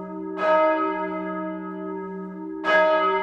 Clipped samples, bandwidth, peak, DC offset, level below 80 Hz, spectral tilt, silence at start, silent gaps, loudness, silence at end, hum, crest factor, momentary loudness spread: under 0.1%; 7.2 kHz; -8 dBFS; under 0.1%; -66 dBFS; -6.5 dB/octave; 0 s; none; -23 LUFS; 0 s; none; 16 dB; 14 LU